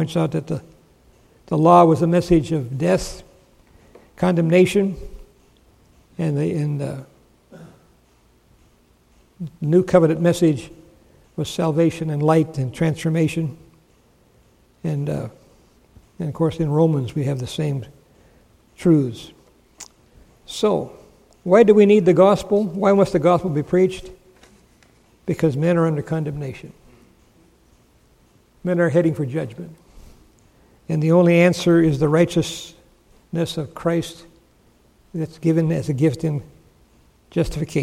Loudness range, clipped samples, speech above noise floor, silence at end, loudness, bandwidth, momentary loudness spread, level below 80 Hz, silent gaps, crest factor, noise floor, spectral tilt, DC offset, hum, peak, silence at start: 10 LU; under 0.1%; 38 dB; 0 s; -19 LUFS; 14 kHz; 19 LU; -46 dBFS; none; 20 dB; -57 dBFS; -7 dB/octave; under 0.1%; none; -2 dBFS; 0 s